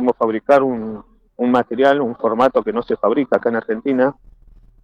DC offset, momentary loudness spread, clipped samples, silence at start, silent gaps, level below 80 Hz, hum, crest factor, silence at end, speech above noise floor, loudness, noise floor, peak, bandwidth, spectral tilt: under 0.1%; 7 LU; under 0.1%; 0 s; none; -52 dBFS; none; 14 dB; 0.7 s; 30 dB; -17 LUFS; -46 dBFS; -2 dBFS; 8.2 kHz; -7.5 dB/octave